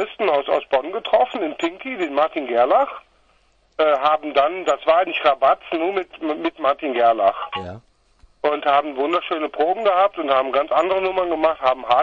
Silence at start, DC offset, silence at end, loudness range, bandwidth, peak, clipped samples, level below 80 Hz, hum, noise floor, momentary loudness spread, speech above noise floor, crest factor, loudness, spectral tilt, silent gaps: 0 s; under 0.1%; 0 s; 2 LU; 7.4 kHz; -2 dBFS; under 0.1%; -58 dBFS; none; -59 dBFS; 9 LU; 40 dB; 18 dB; -20 LUFS; -4.5 dB/octave; none